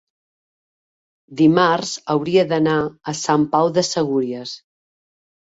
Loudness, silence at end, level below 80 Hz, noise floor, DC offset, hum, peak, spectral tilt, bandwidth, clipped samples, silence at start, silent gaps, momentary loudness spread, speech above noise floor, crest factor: -18 LUFS; 1.05 s; -60 dBFS; under -90 dBFS; under 0.1%; none; -2 dBFS; -5 dB/octave; 8 kHz; under 0.1%; 1.3 s; none; 13 LU; over 72 dB; 18 dB